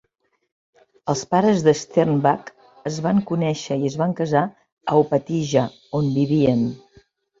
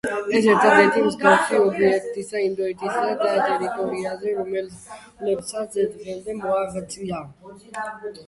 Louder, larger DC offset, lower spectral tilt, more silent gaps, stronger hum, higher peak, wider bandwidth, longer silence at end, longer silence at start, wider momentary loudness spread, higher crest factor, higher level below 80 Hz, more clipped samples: about the same, -21 LUFS vs -21 LUFS; neither; first, -6.5 dB/octave vs -4.5 dB/octave; first, 4.72-4.77 s vs none; neither; about the same, -2 dBFS vs -2 dBFS; second, 7.8 kHz vs 11.5 kHz; first, 0.65 s vs 0.05 s; first, 1.05 s vs 0.05 s; second, 9 LU vs 16 LU; about the same, 18 dB vs 20 dB; about the same, -58 dBFS vs -60 dBFS; neither